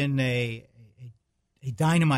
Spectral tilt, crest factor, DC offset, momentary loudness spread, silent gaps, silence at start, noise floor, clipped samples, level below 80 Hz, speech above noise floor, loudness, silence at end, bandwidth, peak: -6.5 dB/octave; 14 dB; under 0.1%; 25 LU; none; 0 s; -70 dBFS; under 0.1%; -60 dBFS; 45 dB; -27 LUFS; 0 s; 14 kHz; -12 dBFS